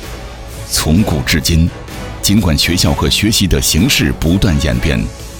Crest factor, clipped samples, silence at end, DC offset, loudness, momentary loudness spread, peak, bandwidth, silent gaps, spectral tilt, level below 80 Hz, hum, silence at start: 12 dB; under 0.1%; 0 s; under 0.1%; -13 LUFS; 15 LU; 0 dBFS; 20 kHz; none; -4 dB/octave; -22 dBFS; none; 0 s